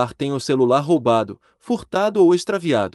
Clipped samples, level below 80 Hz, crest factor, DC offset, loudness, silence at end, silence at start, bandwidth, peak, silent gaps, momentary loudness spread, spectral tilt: under 0.1%; -58 dBFS; 14 dB; under 0.1%; -19 LUFS; 0.05 s; 0 s; 12 kHz; -4 dBFS; none; 9 LU; -6 dB/octave